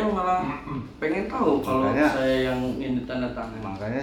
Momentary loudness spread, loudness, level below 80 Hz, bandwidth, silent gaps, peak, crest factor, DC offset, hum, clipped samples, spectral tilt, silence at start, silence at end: 11 LU; -25 LUFS; -46 dBFS; 18 kHz; none; -8 dBFS; 18 dB; under 0.1%; none; under 0.1%; -6.5 dB/octave; 0 s; 0 s